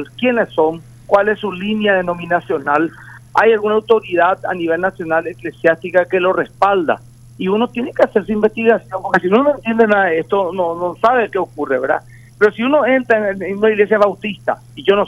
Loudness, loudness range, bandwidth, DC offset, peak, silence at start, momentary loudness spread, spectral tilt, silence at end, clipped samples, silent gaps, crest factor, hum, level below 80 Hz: -16 LUFS; 2 LU; 12 kHz; under 0.1%; 0 dBFS; 0 s; 7 LU; -6.5 dB/octave; 0 s; under 0.1%; none; 16 dB; none; -50 dBFS